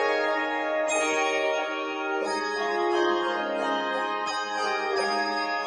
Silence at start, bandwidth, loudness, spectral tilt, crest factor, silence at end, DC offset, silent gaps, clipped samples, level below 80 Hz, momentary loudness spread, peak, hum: 0 s; 11 kHz; -26 LUFS; -2 dB/octave; 16 dB; 0 s; under 0.1%; none; under 0.1%; -70 dBFS; 4 LU; -12 dBFS; none